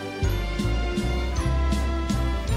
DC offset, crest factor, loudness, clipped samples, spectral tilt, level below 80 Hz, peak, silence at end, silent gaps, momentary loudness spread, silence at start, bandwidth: under 0.1%; 12 dB; -26 LUFS; under 0.1%; -6 dB/octave; -26 dBFS; -12 dBFS; 0 s; none; 2 LU; 0 s; 13 kHz